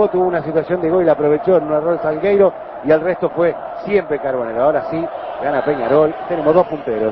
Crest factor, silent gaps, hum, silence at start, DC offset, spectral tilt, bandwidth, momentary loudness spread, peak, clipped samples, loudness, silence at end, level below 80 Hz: 14 dB; none; none; 0 s; under 0.1%; -10 dB/octave; 5.6 kHz; 6 LU; -2 dBFS; under 0.1%; -17 LUFS; 0 s; -50 dBFS